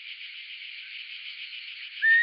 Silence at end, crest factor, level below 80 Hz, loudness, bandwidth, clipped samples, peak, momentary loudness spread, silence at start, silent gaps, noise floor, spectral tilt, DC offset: 0 s; 16 dB; under -90 dBFS; -31 LUFS; 5.6 kHz; under 0.1%; -12 dBFS; 13 LU; 0 s; none; -42 dBFS; 16 dB/octave; under 0.1%